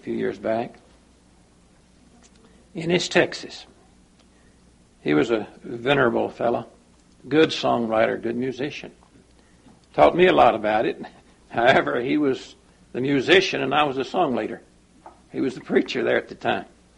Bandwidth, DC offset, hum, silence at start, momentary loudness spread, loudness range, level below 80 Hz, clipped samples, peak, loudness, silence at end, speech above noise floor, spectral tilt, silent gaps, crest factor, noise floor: 11 kHz; under 0.1%; none; 0.05 s; 17 LU; 7 LU; -56 dBFS; under 0.1%; -2 dBFS; -22 LUFS; 0.35 s; 34 dB; -5 dB/octave; none; 22 dB; -56 dBFS